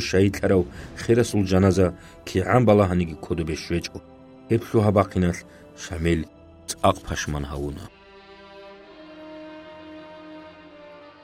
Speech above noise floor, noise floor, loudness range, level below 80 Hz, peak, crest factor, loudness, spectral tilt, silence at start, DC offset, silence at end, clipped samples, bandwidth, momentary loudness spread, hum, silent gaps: 25 dB; -47 dBFS; 16 LU; -42 dBFS; -4 dBFS; 20 dB; -23 LUFS; -6.5 dB/octave; 0 s; under 0.1%; 0.15 s; under 0.1%; 15.5 kHz; 24 LU; none; none